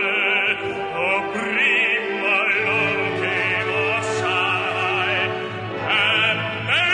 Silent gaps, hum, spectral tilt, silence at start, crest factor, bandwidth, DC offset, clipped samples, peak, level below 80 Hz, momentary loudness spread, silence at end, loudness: none; none; -4 dB/octave; 0 s; 14 dB; 10.5 kHz; under 0.1%; under 0.1%; -6 dBFS; -60 dBFS; 6 LU; 0 s; -19 LUFS